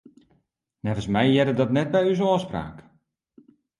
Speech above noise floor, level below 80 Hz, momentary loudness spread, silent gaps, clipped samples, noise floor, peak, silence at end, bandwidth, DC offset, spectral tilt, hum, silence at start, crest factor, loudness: 48 dB; -52 dBFS; 13 LU; none; under 0.1%; -70 dBFS; -6 dBFS; 1 s; 11.5 kHz; under 0.1%; -7 dB/octave; none; 0.85 s; 18 dB; -23 LUFS